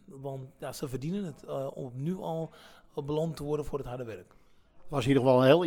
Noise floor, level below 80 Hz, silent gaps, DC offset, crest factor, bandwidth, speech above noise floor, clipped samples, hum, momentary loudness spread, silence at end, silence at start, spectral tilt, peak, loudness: -49 dBFS; -54 dBFS; none; under 0.1%; 22 dB; 18.5 kHz; 19 dB; under 0.1%; none; 17 LU; 0 s; 0.1 s; -7 dB/octave; -10 dBFS; -32 LUFS